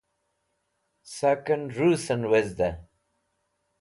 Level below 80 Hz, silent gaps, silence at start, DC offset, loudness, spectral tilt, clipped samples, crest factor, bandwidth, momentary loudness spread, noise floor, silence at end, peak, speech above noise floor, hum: -54 dBFS; none; 1.05 s; under 0.1%; -25 LUFS; -6 dB/octave; under 0.1%; 18 dB; 11.5 kHz; 7 LU; -76 dBFS; 1 s; -10 dBFS; 51 dB; none